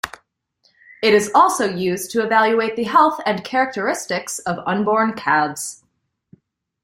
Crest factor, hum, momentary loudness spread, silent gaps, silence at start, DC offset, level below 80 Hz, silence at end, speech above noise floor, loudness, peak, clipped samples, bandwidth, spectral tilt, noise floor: 18 dB; none; 9 LU; none; 0.05 s; under 0.1%; -62 dBFS; 1.1 s; 51 dB; -18 LUFS; -2 dBFS; under 0.1%; 16 kHz; -3.5 dB/octave; -69 dBFS